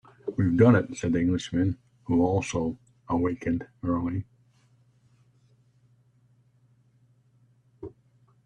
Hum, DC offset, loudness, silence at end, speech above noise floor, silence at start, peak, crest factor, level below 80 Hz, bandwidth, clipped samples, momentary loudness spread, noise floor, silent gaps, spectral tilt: none; under 0.1%; -26 LUFS; 0.55 s; 39 dB; 0.25 s; -6 dBFS; 24 dB; -56 dBFS; 9.4 kHz; under 0.1%; 25 LU; -63 dBFS; none; -7.5 dB/octave